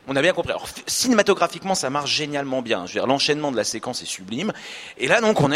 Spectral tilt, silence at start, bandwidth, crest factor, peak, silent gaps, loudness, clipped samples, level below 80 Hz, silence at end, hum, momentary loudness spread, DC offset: -3.5 dB/octave; 0.05 s; 16 kHz; 22 dB; 0 dBFS; none; -22 LUFS; under 0.1%; -56 dBFS; 0 s; none; 11 LU; under 0.1%